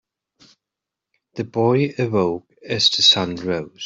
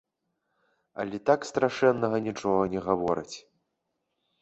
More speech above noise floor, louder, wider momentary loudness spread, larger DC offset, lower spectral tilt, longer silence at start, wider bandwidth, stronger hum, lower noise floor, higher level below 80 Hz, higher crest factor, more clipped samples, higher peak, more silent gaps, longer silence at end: first, 66 dB vs 54 dB; first, -18 LUFS vs -27 LUFS; first, 17 LU vs 14 LU; neither; second, -4 dB/octave vs -6 dB/octave; first, 1.35 s vs 0.95 s; about the same, 8 kHz vs 8.2 kHz; neither; first, -85 dBFS vs -80 dBFS; about the same, -62 dBFS vs -62 dBFS; about the same, 20 dB vs 20 dB; neither; first, -2 dBFS vs -8 dBFS; neither; second, 0 s vs 1 s